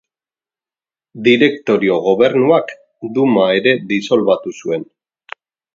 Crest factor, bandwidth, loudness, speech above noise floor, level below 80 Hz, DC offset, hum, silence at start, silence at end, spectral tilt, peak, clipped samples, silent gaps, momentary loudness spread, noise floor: 16 dB; 7.6 kHz; -14 LUFS; over 76 dB; -62 dBFS; under 0.1%; none; 1.15 s; 0.9 s; -6 dB/octave; 0 dBFS; under 0.1%; none; 18 LU; under -90 dBFS